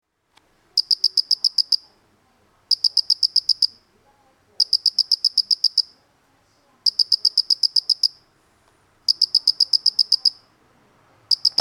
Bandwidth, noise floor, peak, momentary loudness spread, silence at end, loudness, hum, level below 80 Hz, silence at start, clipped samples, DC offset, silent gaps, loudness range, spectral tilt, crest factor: 20 kHz; -61 dBFS; -4 dBFS; 6 LU; 0.1 s; -18 LUFS; none; -74 dBFS; 0.75 s; under 0.1%; under 0.1%; none; 2 LU; 2.5 dB/octave; 20 dB